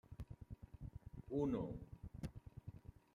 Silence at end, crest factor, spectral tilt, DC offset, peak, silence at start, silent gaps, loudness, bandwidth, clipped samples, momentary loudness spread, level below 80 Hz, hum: 0.15 s; 20 dB; -9 dB/octave; under 0.1%; -30 dBFS; 0.1 s; none; -49 LUFS; 14 kHz; under 0.1%; 16 LU; -60 dBFS; none